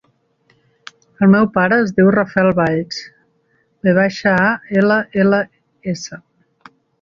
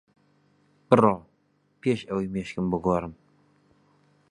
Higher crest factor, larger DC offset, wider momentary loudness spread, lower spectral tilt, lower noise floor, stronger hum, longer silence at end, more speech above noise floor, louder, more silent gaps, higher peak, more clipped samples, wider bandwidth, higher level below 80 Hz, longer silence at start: second, 16 dB vs 26 dB; neither; first, 14 LU vs 11 LU; about the same, -7 dB/octave vs -8 dB/octave; second, -61 dBFS vs -68 dBFS; neither; second, 0.85 s vs 1.2 s; first, 47 dB vs 43 dB; first, -15 LUFS vs -25 LUFS; neither; about the same, 0 dBFS vs -2 dBFS; neither; second, 7.2 kHz vs 10.5 kHz; about the same, -54 dBFS vs -54 dBFS; first, 1.2 s vs 0.9 s